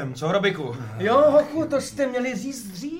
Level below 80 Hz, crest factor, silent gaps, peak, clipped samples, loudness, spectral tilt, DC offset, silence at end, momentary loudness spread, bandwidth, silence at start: -58 dBFS; 16 dB; none; -6 dBFS; under 0.1%; -22 LUFS; -5.5 dB/octave; under 0.1%; 0 s; 14 LU; 16.5 kHz; 0 s